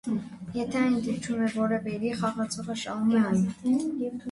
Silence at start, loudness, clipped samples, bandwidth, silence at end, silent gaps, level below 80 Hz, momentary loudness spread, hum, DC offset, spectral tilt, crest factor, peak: 0.05 s; -28 LUFS; under 0.1%; 11.5 kHz; 0 s; none; -60 dBFS; 8 LU; none; under 0.1%; -6 dB/octave; 14 dB; -14 dBFS